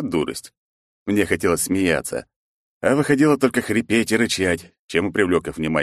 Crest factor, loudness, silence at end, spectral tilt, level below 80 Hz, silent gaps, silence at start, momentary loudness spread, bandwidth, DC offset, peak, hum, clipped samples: 18 dB; -20 LUFS; 0 s; -4.5 dB/octave; -50 dBFS; 0.57-1.06 s, 2.36-2.81 s, 4.79-4.88 s; 0 s; 11 LU; 13 kHz; under 0.1%; -4 dBFS; none; under 0.1%